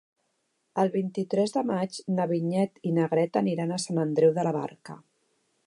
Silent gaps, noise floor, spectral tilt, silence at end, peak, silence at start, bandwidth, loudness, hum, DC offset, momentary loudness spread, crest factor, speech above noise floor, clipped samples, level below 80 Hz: none; -75 dBFS; -6.5 dB/octave; 0.7 s; -10 dBFS; 0.75 s; 11.5 kHz; -27 LUFS; none; under 0.1%; 9 LU; 18 dB; 49 dB; under 0.1%; -78 dBFS